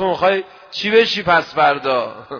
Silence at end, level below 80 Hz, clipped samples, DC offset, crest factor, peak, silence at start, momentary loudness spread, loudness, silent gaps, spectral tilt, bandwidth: 0 s; -54 dBFS; under 0.1%; under 0.1%; 16 dB; 0 dBFS; 0 s; 9 LU; -16 LUFS; none; -4.5 dB/octave; 5.4 kHz